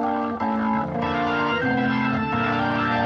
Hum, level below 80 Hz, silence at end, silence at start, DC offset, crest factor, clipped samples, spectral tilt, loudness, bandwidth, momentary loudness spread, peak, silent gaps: none; -50 dBFS; 0 s; 0 s; under 0.1%; 12 dB; under 0.1%; -7.5 dB/octave; -23 LUFS; 6.8 kHz; 3 LU; -10 dBFS; none